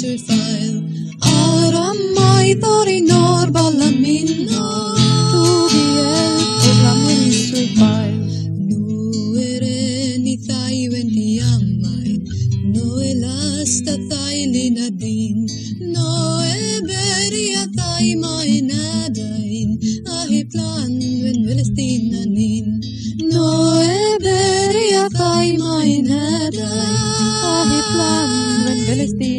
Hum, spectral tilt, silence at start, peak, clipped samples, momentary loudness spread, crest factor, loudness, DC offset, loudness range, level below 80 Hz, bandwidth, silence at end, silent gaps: none; -5 dB/octave; 0 s; 0 dBFS; under 0.1%; 8 LU; 16 dB; -16 LUFS; under 0.1%; 6 LU; -44 dBFS; 12.5 kHz; 0 s; none